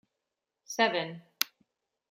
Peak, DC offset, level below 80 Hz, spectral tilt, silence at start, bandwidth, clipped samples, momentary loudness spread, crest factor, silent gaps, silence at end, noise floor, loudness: -2 dBFS; under 0.1%; -84 dBFS; -2.5 dB/octave; 0.7 s; 16 kHz; under 0.1%; 11 LU; 34 dB; none; 0.65 s; -87 dBFS; -31 LUFS